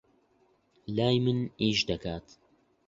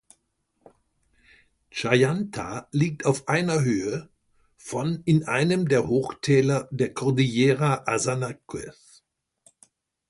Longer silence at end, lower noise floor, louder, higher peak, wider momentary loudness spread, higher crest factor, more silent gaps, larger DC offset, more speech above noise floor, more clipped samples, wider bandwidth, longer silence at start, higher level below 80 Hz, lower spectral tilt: second, 0.7 s vs 1.4 s; second, -68 dBFS vs -73 dBFS; second, -29 LUFS vs -24 LUFS; second, -12 dBFS vs -4 dBFS; about the same, 14 LU vs 13 LU; about the same, 20 dB vs 20 dB; neither; neither; second, 39 dB vs 49 dB; neither; second, 7.8 kHz vs 11.5 kHz; second, 0.9 s vs 1.75 s; about the same, -56 dBFS vs -58 dBFS; about the same, -5.5 dB/octave vs -6 dB/octave